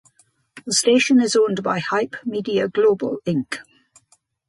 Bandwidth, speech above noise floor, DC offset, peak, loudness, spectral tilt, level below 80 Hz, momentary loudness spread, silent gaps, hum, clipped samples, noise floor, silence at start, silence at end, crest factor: 11.5 kHz; 42 dB; under 0.1%; -6 dBFS; -19 LUFS; -4 dB/octave; -66 dBFS; 11 LU; none; none; under 0.1%; -62 dBFS; 0.55 s; 0.85 s; 16 dB